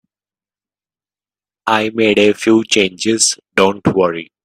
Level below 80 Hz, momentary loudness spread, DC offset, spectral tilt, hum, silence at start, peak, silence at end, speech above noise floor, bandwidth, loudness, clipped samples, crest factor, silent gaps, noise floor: -56 dBFS; 5 LU; under 0.1%; -3.5 dB/octave; 50 Hz at -50 dBFS; 1.65 s; 0 dBFS; 0.2 s; over 76 dB; 14 kHz; -14 LUFS; under 0.1%; 16 dB; none; under -90 dBFS